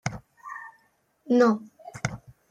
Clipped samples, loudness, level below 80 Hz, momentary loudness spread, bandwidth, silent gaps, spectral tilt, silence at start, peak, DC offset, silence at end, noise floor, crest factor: under 0.1%; -25 LUFS; -58 dBFS; 23 LU; 10 kHz; none; -6 dB/octave; 0.05 s; -8 dBFS; under 0.1%; 0.35 s; -67 dBFS; 20 dB